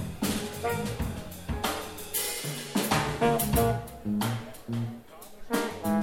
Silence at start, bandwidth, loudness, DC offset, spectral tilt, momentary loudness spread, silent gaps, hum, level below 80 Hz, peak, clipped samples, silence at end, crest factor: 0 s; 17 kHz; -30 LUFS; under 0.1%; -4.5 dB/octave; 11 LU; none; none; -44 dBFS; -10 dBFS; under 0.1%; 0 s; 20 dB